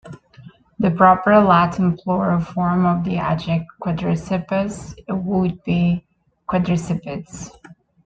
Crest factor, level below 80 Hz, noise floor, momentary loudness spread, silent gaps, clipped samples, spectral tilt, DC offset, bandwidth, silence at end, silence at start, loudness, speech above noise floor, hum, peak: 18 dB; -46 dBFS; -45 dBFS; 14 LU; none; under 0.1%; -7.5 dB/octave; under 0.1%; 8.6 kHz; 0.35 s; 0.05 s; -19 LUFS; 27 dB; none; -2 dBFS